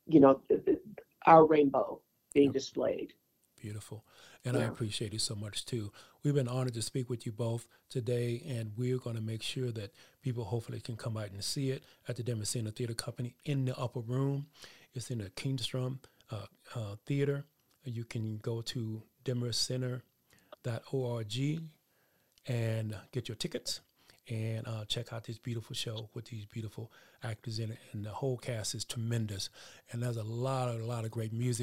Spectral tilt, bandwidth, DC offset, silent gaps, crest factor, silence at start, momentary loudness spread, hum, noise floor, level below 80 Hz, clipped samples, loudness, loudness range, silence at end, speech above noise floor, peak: -5.5 dB/octave; 16 kHz; under 0.1%; none; 26 dB; 0.05 s; 14 LU; none; -73 dBFS; -68 dBFS; under 0.1%; -34 LUFS; 7 LU; 0 s; 39 dB; -8 dBFS